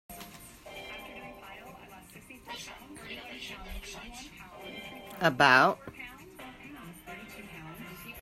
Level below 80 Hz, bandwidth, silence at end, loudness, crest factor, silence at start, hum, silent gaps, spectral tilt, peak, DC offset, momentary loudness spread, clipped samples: -56 dBFS; 16 kHz; 0 s; -29 LUFS; 26 dB; 0.1 s; none; none; -4 dB/octave; -8 dBFS; under 0.1%; 24 LU; under 0.1%